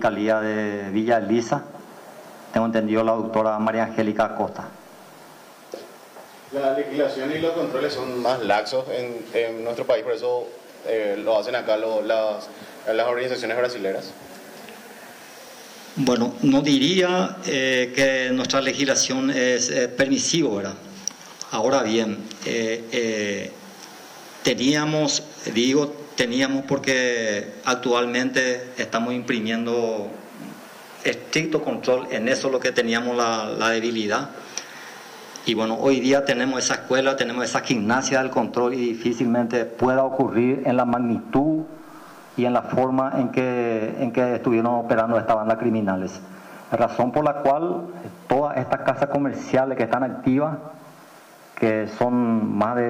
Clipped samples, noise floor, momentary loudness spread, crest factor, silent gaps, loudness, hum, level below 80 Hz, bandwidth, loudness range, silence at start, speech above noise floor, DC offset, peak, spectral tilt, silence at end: under 0.1%; -47 dBFS; 18 LU; 14 dB; none; -22 LUFS; none; -62 dBFS; 16 kHz; 5 LU; 0 s; 25 dB; under 0.1%; -10 dBFS; -4 dB/octave; 0 s